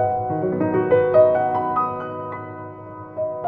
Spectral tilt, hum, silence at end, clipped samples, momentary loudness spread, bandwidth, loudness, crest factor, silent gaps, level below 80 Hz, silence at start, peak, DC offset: -10.5 dB/octave; none; 0 s; under 0.1%; 19 LU; 4.6 kHz; -20 LUFS; 16 dB; none; -58 dBFS; 0 s; -4 dBFS; under 0.1%